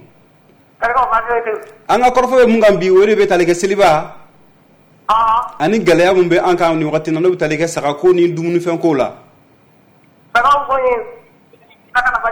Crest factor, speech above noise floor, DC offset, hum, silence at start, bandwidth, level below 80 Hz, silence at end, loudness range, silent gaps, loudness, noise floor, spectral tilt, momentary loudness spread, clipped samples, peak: 12 dB; 37 dB; under 0.1%; none; 0.8 s; over 20 kHz; -44 dBFS; 0 s; 5 LU; none; -13 LUFS; -49 dBFS; -5.5 dB/octave; 8 LU; under 0.1%; -4 dBFS